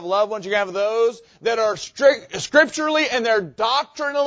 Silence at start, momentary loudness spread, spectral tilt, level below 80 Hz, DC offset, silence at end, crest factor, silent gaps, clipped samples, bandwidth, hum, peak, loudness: 0 s; 6 LU; -2.5 dB/octave; -62 dBFS; under 0.1%; 0 s; 18 dB; none; under 0.1%; 8 kHz; none; -2 dBFS; -20 LUFS